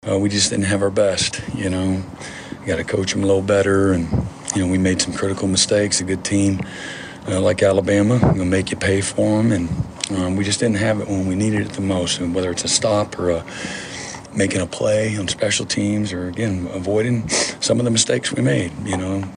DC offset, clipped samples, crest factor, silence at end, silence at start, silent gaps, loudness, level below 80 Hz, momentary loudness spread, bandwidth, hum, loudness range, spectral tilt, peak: under 0.1%; under 0.1%; 18 dB; 0 s; 0.05 s; none; -19 LUFS; -42 dBFS; 8 LU; 11 kHz; none; 3 LU; -4.5 dB/octave; 0 dBFS